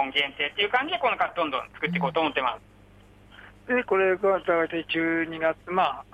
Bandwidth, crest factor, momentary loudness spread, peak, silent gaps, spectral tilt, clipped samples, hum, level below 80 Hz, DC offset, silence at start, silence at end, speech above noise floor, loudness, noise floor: 9.8 kHz; 16 dB; 6 LU; -10 dBFS; none; -6 dB/octave; under 0.1%; 50 Hz at -55 dBFS; -60 dBFS; under 0.1%; 0 s; 0.1 s; 27 dB; -25 LUFS; -53 dBFS